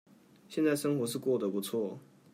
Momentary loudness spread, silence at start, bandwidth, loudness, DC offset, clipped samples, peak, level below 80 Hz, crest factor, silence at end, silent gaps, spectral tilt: 10 LU; 0.5 s; 16 kHz; -33 LUFS; under 0.1%; under 0.1%; -16 dBFS; -82 dBFS; 16 dB; 0.3 s; none; -5.5 dB/octave